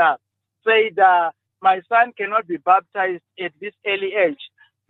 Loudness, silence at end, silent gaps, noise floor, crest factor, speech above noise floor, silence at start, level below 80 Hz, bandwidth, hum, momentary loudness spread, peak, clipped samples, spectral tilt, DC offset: -19 LUFS; 0.45 s; none; -45 dBFS; 16 dB; 26 dB; 0 s; -76 dBFS; 4.1 kHz; none; 14 LU; -4 dBFS; under 0.1%; -6 dB/octave; under 0.1%